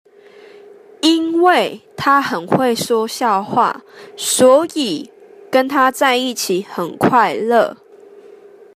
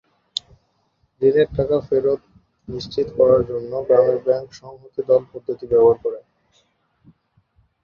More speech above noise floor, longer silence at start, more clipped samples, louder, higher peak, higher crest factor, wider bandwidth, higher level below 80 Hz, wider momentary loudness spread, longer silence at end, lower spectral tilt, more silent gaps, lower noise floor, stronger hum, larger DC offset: second, 27 dB vs 47 dB; second, 1.05 s vs 1.2 s; neither; first, -15 LUFS vs -19 LUFS; about the same, 0 dBFS vs -2 dBFS; about the same, 16 dB vs 18 dB; first, 15.5 kHz vs 7.6 kHz; second, -60 dBFS vs -50 dBFS; second, 8 LU vs 15 LU; second, 0.4 s vs 1.65 s; second, -3.5 dB/octave vs -7 dB/octave; neither; second, -43 dBFS vs -66 dBFS; neither; neither